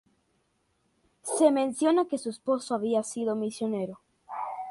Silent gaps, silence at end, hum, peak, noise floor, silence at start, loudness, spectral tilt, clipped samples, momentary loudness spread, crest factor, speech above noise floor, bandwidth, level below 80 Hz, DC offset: none; 0 s; none; -10 dBFS; -73 dBFS; 1.25 s; -28 LUFS; -4.5 dB/octave; under 0.1%; 14 LU; 20 dB; 46 dB; 11.5 kHz; -76 dBFS; under 0.1%